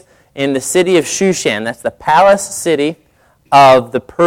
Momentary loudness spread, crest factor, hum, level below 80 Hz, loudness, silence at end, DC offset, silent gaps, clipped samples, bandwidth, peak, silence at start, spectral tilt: 12 LU; 12 dB; none; -50 dBFS; -12 LUFS; 0 s; under 0.1%; none; under 0.1%; 16.5 kHz; 0 dBFS; 0.35 s; -4 dB/octave